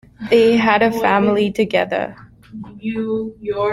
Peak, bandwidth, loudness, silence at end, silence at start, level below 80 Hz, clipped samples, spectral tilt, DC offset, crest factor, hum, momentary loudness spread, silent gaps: -2 dBFS; 13.5 kHz; -17 LUFS; 0 s; 0.2 s; -52 dBFS; under 0.1%; -6 dB/octave; under 0.1%; 16 dB; none; 15 LU; none